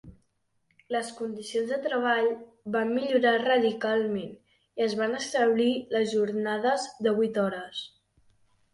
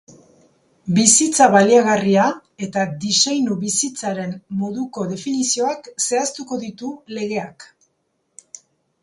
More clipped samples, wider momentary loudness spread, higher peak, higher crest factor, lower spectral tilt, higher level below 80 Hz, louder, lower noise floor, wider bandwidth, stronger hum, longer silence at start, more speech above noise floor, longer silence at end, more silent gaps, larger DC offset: neither; second, 12 LU vs 16 LU; second, -12 dBFS vs 0 dBFS; about the same, 16 dB vs 20 dB; first, -4.5 dB/octave vs -3 dB/octave; about the same, -68 dBFS vs -64 dBFS; second, -27 LUFS vs -18 LUFS; first, -73 dBFS vs -69 dBFS; about the same, 11.5 kHz vs 11.5 kHz; neither; second, 0.05 s vs 0.85 s; second, 46 dB vs 51 dB; second, 0.85 s vs 1.4 s; neither; neither